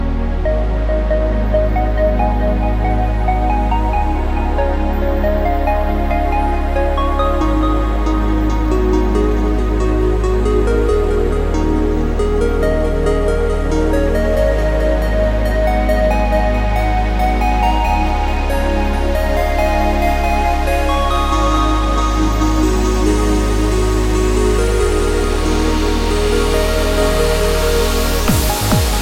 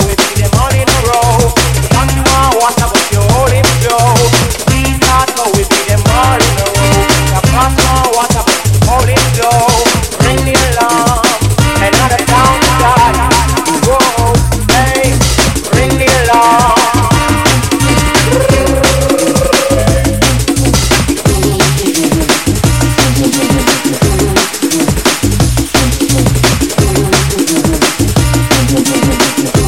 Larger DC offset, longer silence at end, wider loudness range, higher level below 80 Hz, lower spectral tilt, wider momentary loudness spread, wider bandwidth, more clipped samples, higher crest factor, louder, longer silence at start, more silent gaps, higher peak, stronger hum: about the same, 0.5% vs 1%; about the same, 0 s vs 0 s; about the same, 1 LU vs 2 LU; about the same, -16 dBFS vs -18 dBFS; first, -6 dB/octave vs -4 dB/octave; about the same, 3 LU vs 3 LU; about the same, 17 kHz vs 17 kHz; neither; about the same, 12 dB vs 10 dB; second, -16 LUFS vs -9 LUFS; about the same, 0 s vs 0 s; neither; about the same, -2 dBFS vs 0 dBFS; neither